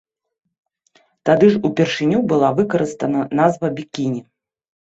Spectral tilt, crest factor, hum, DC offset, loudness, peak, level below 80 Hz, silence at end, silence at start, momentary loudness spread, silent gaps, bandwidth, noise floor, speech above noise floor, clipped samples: -6.5 dB/octave; 18 dB; none; under 0.1%; -18 LUFS; 0 dBFS; -58 dBFS; 0.75 s; 1.25 s; 10 LU; none; 8 kHz; -59 dBFS; 42 dB; under 0.1%